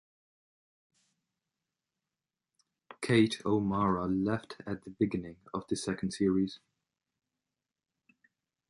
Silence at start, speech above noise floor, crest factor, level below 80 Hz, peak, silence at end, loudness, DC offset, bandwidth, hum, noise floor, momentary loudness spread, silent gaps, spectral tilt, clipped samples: 2.9 s; over 59 dB; 22 dB; -62 dBFS; -12 dBFS; 2.15 s; -32 LUFS; under 0.1%; 11.5 kHz; none; under -90 dBFS; 14 LU; none; -6 dB/octave; under 0.1%